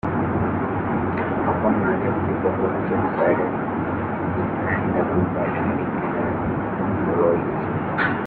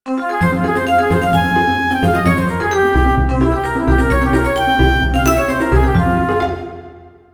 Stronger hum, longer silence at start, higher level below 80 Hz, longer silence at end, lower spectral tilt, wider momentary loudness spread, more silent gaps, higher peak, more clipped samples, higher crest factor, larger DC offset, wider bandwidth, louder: neither; about the same, 0.05 s vs 0.05 s; second, -46 dBFS vs -22 dBFS; second, 0 s vs 0.25 s; first, -11.5 dB/octave vs -6.5 dB/octave; about the same, 4 LU vs 4 LU; neither; second, -6 dBFS vs 0 dBFS; neither; about the same, 16 dB vs 14 dB; neither; second, 4.6 kHz vs 19.5 kHz; second, -22 LUFS vs -15 LUFS